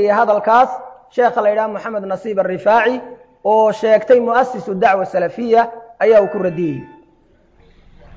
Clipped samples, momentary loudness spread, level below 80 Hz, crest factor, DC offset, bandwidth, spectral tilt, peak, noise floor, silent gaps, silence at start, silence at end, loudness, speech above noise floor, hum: under 0.1%; 11 LU; -56 dBFS; 14 dB; under 0.1%; 7.8 kHz; -6.5 dB/octave; -2 dBFS; -52 dBFS; none; 0 s; 1.3 s; -15 LUFS; 38 dB; none